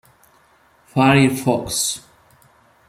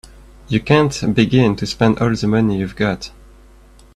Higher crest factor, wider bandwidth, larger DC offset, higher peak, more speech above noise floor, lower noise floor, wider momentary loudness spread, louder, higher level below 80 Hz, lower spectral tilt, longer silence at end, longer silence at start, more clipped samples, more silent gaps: about the same, 18 dB vs 16 dB; first, 16 kHz vs 12 kHz; neither; about the same, -2 dBFS vs 0 dBFS; first, 39 dB vs 29 dB; first, -55 dBFS vs -45 dBFS; first, 11 LU vs 8 LU; about the same, -17 LUFS vs -17 LUFS; second, -50 dBFS vs -40 dBFS; second, -4.5 dB/octave vs -6.5 dB/octave; about the same, 0.9 s vs 0.85 s; first, 0.95 s vs 0.5 s; neither; neither